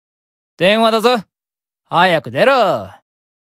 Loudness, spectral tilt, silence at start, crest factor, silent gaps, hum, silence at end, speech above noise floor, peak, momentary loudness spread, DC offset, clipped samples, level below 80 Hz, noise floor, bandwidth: -14 LUFS; -5 dB/octave; 0.6 s; 16 dB; none; none; 0.7 s; over 77 dB; 0 dBFS; 7 LU; under 0.1%; under 0.1%; -60 dBFS; under -90 dBFS; 16 kHz